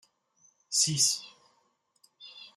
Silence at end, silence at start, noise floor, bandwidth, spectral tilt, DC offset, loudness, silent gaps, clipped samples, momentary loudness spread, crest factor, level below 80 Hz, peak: 0.1 s; 0.7 s; -72 dBFS; 14 kHz; -1 dB/octave; under 0.1%; -26 LUFS; none; under 0.1%; 24 LU; 22 dB; -76 dBFS; -12 dBFS